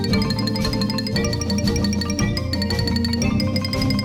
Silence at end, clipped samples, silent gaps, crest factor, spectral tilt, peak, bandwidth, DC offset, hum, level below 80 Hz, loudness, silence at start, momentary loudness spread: 0 s; under 0.1%; none; 14 dB; -5.5 dB/octave; -6 dBFS; 18 kHz; under 0.1%; none; -34 dBFS; -21 LUFS; 0 s; 2 LU